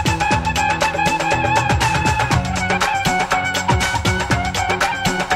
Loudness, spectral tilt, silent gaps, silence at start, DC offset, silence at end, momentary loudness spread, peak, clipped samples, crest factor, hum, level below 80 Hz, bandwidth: -17 LUFS; -4 dB/octave; none; 0 s; under 0.1%; 0 s; 2 LU; -4 dBFS; under 0.1%; 14 dB; none; -32 dBFS; 16.5 kHz